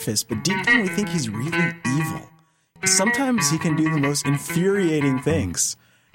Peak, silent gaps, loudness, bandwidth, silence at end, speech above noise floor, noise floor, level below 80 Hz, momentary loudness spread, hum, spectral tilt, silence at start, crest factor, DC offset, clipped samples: -4 dBFS; none; -21 LUFS; 16.5 kHz; 0.4 s; 34 dB; -55 dBFS; -54 dBFS; 7 LU; none; -4 dB/octave; 0 s; 18 dB; under 0.1%; under 0.1%